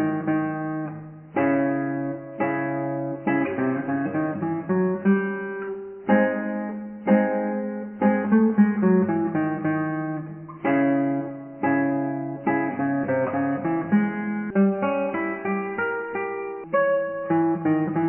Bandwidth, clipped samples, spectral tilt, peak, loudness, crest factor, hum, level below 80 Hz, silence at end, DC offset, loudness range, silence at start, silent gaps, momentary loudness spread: 3.2 kHz; under 0.1%; -12 dB/octave; -6 dBFS; -24 LUFS; 16 dB; none; -64 dBFS; 0 s; under 0.1%; 3 LU; 0 s; none; 10 LU